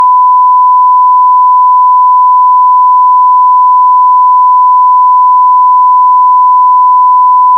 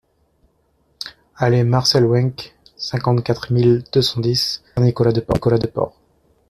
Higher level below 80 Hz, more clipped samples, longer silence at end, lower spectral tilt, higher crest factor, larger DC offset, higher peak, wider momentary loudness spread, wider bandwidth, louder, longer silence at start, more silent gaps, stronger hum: second, under -90 dBFS vs -46 dBFS; neither; second, 0 s vs 0.6 s; second, -1 dB/octave vs -6 dB/octave; second, 4 dB vs 16 dB; neither; about the same, 0 dBFS vs -2 dBFS; second, 0 LU vs 17 LU; second, 1.1 kHz vs 13.5 kHz; first, -4 LUFS vs -18 LUFS; second, 0 s vs 1 s; neither; neither